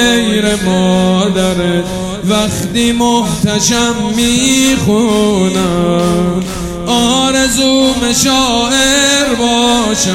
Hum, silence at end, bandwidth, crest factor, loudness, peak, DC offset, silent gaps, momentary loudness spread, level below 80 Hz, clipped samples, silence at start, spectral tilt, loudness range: none; 0 s; 16.5 kHz; 12 dB; -11 LUFS; 0 dBFS; under 0.1%; none; 5 LU; -32 dBFS; under 0.1%; 0 s; -3.5 dB/octave; 2 LU